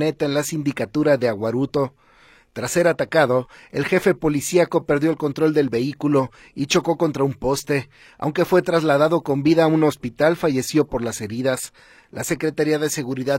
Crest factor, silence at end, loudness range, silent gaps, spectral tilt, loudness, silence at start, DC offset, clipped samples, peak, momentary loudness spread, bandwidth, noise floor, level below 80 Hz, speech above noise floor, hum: 18 dB; 0 s; 3 LU; none; -5.5 dB/octave; -20 LUFS; 0 s; under 0.1%; under 0.1%; -2 dBFS; 9 LU; 16.5 kHz; -53 dBFS; -52 dBFS; 33 dB; none